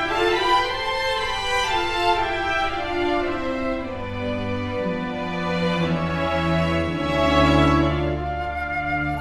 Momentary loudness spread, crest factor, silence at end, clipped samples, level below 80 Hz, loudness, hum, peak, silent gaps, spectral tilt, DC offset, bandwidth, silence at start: 9 LU; 16 dB; 0 s; under 0.1%; -36 dBFS; -22 LUFS; none; -6 dBFS; none; -5.5 dB/octave; under 0.1%; 13.5 kHz; 0 s